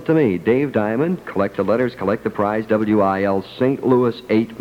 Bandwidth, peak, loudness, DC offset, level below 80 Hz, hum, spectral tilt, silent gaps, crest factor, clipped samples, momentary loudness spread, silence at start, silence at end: 16 kHz; -4 dBFS; -19 LUFS; under 0.1%; -54 dBFS; none; -8.5 dB/octave; none; 14 dB; under 0.1%; 5 LU; 0 s; 0 s